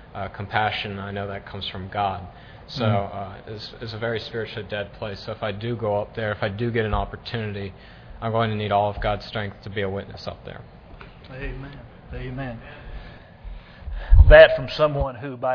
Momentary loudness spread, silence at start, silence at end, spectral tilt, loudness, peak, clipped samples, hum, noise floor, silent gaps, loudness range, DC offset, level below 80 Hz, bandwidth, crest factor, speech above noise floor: 19 LU; 0.1 s; 0 s; -7.5 dB/octave; -23 LUFS; 0 dBFS; under 0.1%; none; -43 dBFS; none; 16 LU; under 0.1%; -28 dBFS; 5.4 kHz; 22 dB; 21 dB